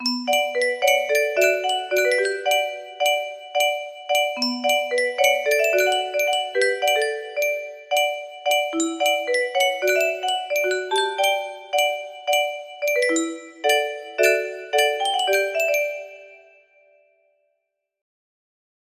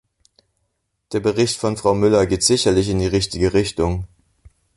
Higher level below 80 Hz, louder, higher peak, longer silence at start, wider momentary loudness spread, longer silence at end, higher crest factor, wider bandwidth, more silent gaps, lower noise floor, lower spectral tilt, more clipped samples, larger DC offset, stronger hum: second, -74 dBFS vs -38 dBFS; second, -21 LUFS vs -18 LUFS; about the same, -4 dBFS vs -2 dBFS; second, 0 s vs 1.1 s; about the same, 6 LU vs 7 LU; first, 2.65 s vs 0.7 s; about the same, 18 dB vs 18 dB; first, 15.5 kHz vs 11.5 kHz; neither; first, -77 dBFS vs -72 dBFS; second, 0.5 dB/octave vs -4.5 dB/octave; neither; neither; neither